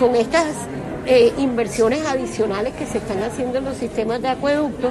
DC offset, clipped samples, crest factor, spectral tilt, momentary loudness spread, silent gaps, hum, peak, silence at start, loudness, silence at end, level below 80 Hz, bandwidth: under 0.1%; under 0.1%; 16 dB; -5 dB/octave; 9 LU; none; none; -4 dBFS; 0 s; -20 LUFS; 0 s; -44 dBFS; 13 kHz